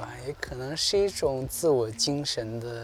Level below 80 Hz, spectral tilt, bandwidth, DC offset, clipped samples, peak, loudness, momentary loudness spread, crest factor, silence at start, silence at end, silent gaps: -50 dBFS; -3.5 dB/octave; 17 kHz; under 0.1%; under 0.1%; -14 dBFS; -28 LUFS; 11 LU; 14 dB; 0 s; 0 s; none